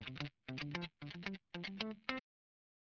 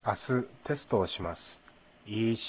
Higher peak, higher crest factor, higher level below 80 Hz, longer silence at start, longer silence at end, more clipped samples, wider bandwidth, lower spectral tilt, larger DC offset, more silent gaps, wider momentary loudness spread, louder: second, -18 dBFS vs -14 dBFS; first, 30 dB vs 20 dB; second, -72 dBFS vs -56 dBFS; about the same, 0 s vs 0.05 s; first, 0.65 s vs 0 s; neither; first, 7.2 kHz vs 4 kHz; second, -3.5 dB/octave vs -5 dB/octave; neither; neither; second, 4 LU vs 11 LU; second, -46 LUFS vs -33 LUFS